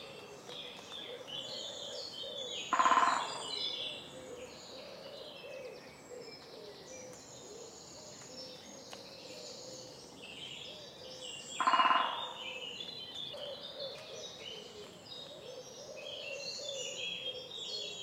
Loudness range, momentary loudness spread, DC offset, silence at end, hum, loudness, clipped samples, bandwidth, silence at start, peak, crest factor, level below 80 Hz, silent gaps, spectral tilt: 14 LU; 18 LU; under 0.1%; 0 s; none; -38 LUFS; under 0.1%; 16 kHz; 0 s; -14 dBFS; 26 dB; -76 dBFS; none; -1.5 dB/octave